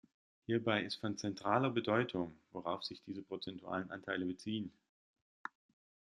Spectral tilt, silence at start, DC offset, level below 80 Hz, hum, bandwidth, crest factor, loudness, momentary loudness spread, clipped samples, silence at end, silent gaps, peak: -5.5 dB/octave; 0.5 s; under 0.1%; -78 dBFS; none; 11 kHz; 24 dB; -39 LUFS; 16 LU; under 0.1%; 0.7 s; 4.89-5.14 s, 5.21-5.45 s; -16 dBFS